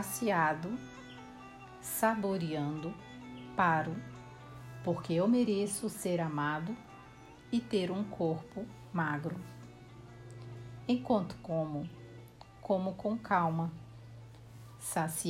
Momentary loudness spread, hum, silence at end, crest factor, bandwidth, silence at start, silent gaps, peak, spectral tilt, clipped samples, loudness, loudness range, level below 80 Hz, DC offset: 22 LU; none; 0 s; 20 dB; 16 kHz; 0 s; none; -16 dBFS; -5.5 dB/octave; under 0.1%; -34 LUFS; 4 LU; -64 dBFS; under 0.1%